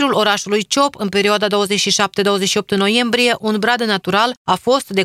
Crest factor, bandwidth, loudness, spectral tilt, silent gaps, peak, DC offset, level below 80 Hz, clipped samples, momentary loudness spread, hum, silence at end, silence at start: 16 dB; 16 kHz; -15 LUFS; -3 dB/octave; 4.37-4.45 s; 0 dBFS; under 0.1%; -58 dBFS; under 0.1%; 3 LU; none; 0 s; 0 s